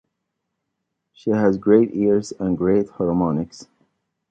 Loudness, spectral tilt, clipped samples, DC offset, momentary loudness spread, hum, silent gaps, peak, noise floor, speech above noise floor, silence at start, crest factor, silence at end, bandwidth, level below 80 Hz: -20 LUFS; -8 dB/octave; under 0.1%; under 0.1%; 10 LU; none; none; -2 dBFS; -78 dBFS; 59 dB; 1.25 s; 18 dB; 0.65 s; 9 kHz; -52 dBFS